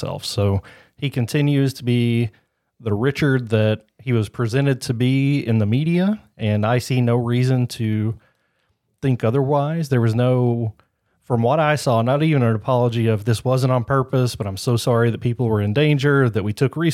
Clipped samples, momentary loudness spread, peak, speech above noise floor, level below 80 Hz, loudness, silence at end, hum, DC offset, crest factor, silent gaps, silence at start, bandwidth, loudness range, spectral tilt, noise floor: under 0.1%; 7 LU; -4 dBFS; 49 dB; -54 dBFS; -20 LUFS; 0 s; none; under 0.1%; 16 dB; none; 0 s; 14.5 kHz; 2 LU; -7 dB/octave; -68 dBFS